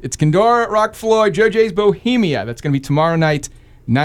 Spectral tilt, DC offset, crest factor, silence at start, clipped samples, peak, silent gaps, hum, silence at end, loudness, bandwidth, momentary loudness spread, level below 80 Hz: -6 dB/octave; under 0.1%; 12 dB; 0 s; under 0.1%; -2 dBFS; none; none; 0 s; -15 LUFS; 15 kHz; 8 LU; -44 dBFS